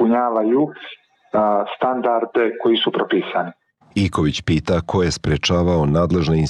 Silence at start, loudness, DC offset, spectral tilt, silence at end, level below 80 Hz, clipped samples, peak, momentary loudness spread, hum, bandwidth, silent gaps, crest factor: 0 s; -19 LUFS; under 0.1%; -6 dB/octave; 0 s; -38 dBFS; under 0.1%; -8 dBFS; 7 LU; none; 10.5 kHz; none; 10 dB